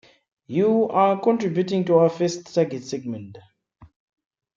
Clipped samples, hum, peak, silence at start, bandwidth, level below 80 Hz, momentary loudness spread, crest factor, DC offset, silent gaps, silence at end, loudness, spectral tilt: under 0.1%; none; -6 dBFS; 0.5 s; 7.6 kHz; -66 dBFS; 12 LU; 18 dB; under 0.1%; none; 0.7 s; -21 LUFS; -6.5 dB/octave